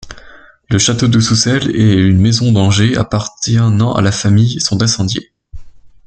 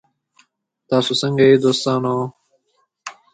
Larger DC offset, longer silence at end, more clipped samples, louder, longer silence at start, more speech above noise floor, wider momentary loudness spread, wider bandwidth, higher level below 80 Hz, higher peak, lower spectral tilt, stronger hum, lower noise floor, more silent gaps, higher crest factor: neither; about the same, 0.2 s vs 0.2 s; neither; first, -12 LUFS vs -17 LUFS; second, 0 s vs 0.9 s; second, 28 dB vs 50 dB; second, 6 LU vs 23 LU; about the same, 9 kHz vs 9.4 kHz; first, -38 dBFS vs -62 dBFS; about the same, 0 dBFS vs -2 dBFS; about the same, -5 dB/octave vs -5.5 dB/octave; neither; second, -39 dBFS vs -66 dBFS; neither; second, 12 dB vs 18 dB